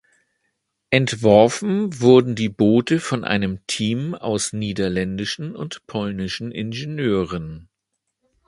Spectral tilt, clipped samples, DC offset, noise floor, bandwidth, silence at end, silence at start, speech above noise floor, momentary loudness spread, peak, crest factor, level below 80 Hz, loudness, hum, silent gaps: -5.5 dB/octave; under 0.1%; under 0.1%; -78 dBFS; 11.5 kHz; 0.85 s; 0.9 s; 58 dB; 13 LU; 0 dBFS; 20 dB; -50 dBFS; -20 LUFS; none; none